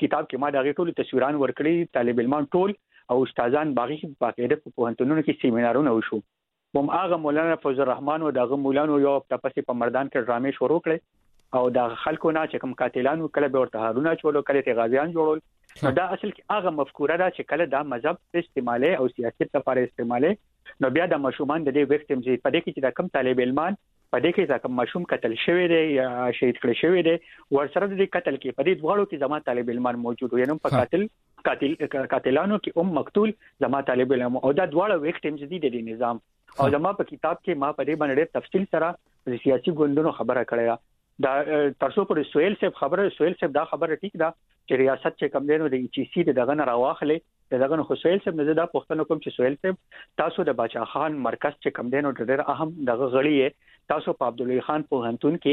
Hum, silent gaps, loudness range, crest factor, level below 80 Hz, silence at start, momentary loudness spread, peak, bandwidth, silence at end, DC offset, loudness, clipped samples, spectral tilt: none; none; 2 LU; 16 dB; -64 dBFS; 0 s; 6 LU; -8 dBFS; 5 kHz; 0 s; under 0.1%; -24 LUFS; under 0.1%; -8.5 dB/octave